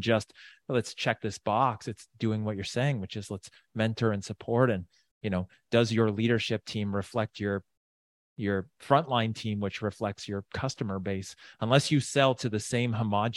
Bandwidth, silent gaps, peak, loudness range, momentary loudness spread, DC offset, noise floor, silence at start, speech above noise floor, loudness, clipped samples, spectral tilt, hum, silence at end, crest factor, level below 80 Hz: 12 kHz; 5.11-5.21 s, 7.77-8.36 s; -6 dBFS; 2 LU; 11 LU; under 0.1%; under -90 dBFS; 0 s; over 61 dB; -30 LUFS; under 0.1%; -5.5 dB/octave; none; 0 s; 22 dB; -64 dBFS